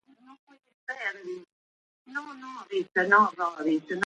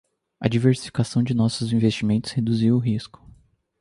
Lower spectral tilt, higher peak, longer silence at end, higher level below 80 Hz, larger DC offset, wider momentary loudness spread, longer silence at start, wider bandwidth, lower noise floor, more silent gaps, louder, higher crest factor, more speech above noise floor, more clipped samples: second, -5 dB/octave vs -7 dB/octave; about the same, -8 dBFS vs -6 dBFS; second, 0 s vs 0.75 s; second, -80 dBFS vs -52 dBFS; neither; first, 20 LU vs 7 LU; about the same, 0.3 s vs 0.4 s; second, 8.8 kHz vs 11.5 kHz; first, under -90 dBFS vs -55 dBFS; first, 0.39-0.47 s, 0.74-0.87 s, 1.52-2.05 s vs none; second, -27 LUFS vs -22 LUFS; first, 22 dB vs 16 dB; first, over 63 dB vs 34 dB; neither